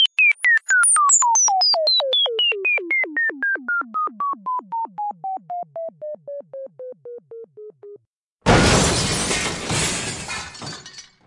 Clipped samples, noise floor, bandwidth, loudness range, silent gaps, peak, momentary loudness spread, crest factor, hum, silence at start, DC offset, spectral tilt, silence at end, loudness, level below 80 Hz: under 0.1%; -63 dBFS; 11.5 kHz; 16 LU; 8.07-8.39 s; -2 dBFS; 22 LU; 20 dB; none; 0 s; under 0.1%; -1.5 dB/octave; 0.25 s; -18 LUFS; -40 dBFS